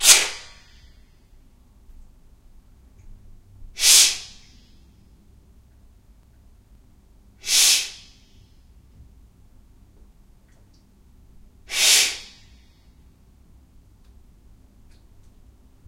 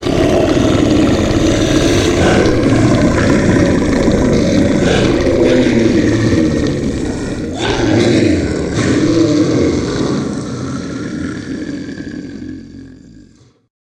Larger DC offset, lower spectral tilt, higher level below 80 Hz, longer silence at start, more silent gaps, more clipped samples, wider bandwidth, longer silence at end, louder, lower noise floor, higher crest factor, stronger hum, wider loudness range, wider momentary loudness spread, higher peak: neither; second, 2.5 dB/octave vs -6 dB/octave; second, -50 dBFS vs -28 dBFS; about the same, 0 s vs 0 s; neither; neither; first, 16 kHz vs 12.5 kHz; first, 3.65 s vs 1.05 s; second, -16 LUFS vs -13 LUFS; first, -53 dBFS vs -45 dBFS; first, 26 dB vs 12 dB; neither; second, 7 LU vs 10 LU; first, 26 LU vs 12 LU; about the same, 0 dBFS vs 0 dBFS